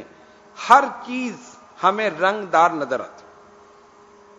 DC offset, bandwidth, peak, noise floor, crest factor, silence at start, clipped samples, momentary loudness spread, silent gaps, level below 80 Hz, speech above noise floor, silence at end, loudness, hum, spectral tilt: under 0.1%; 12 kHz; 0 dBFS; -49 dBFS; 22 dB; 0 s; under 0.1%; 17 LU; none; -68 dBFS; 30 dB; 1.3 s; -19 LUFS; none; -4 dB/octave